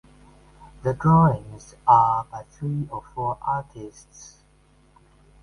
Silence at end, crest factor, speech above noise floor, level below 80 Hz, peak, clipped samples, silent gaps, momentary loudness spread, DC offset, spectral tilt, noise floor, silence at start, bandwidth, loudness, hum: 1.2 s; 20 dB; 35 dB; -50 dBFS; -4 dBFS; under 0.1%; none; 23 LU; under 0.1%; -8.5 dB/octave; -58 dBFS; 0.85 s; 10.5 kHz; -22 LUFS; none